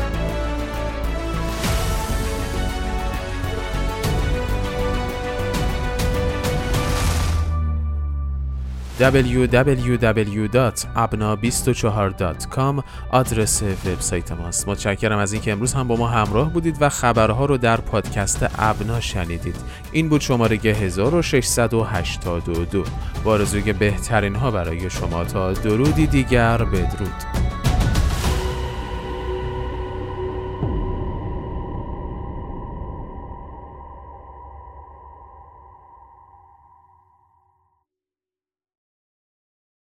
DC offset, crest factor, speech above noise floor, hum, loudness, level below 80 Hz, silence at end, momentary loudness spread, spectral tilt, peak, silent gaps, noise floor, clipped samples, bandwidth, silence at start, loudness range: under 0.1%; 20 dB; over 71 dB; none; -21 LUFS; -28 dBFS; 3.95 s; 12 LU; -5 dB/octave; -2 dBFS; none; under -90 dBFS; under 0.1%; 16.5 kHz; 0 s; 10 LU